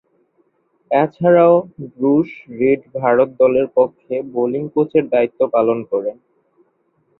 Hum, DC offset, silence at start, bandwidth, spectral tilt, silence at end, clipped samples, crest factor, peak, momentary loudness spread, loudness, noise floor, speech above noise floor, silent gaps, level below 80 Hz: none; under 0.1%; 0.9 s; 4.1 kHz; -11 dB/octave; 1.1 s; under 0.1%; 16 dB; -2 dBFS; 9 LU; -16 LUFS; -63 dBFS; 47 dB; none; -60 dBFS